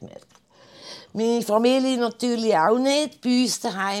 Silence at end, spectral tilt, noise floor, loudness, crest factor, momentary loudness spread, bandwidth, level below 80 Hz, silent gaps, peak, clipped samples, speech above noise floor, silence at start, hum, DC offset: 0 s; -3.5 dB/octave; -54 dBFS; -22 LUFS; 16 dB; 7 LU; 15.5 kHz; -74 dBFS; none; -6 dBFS; under 0.1%; 33 dB; 0 s; none; under 0.1%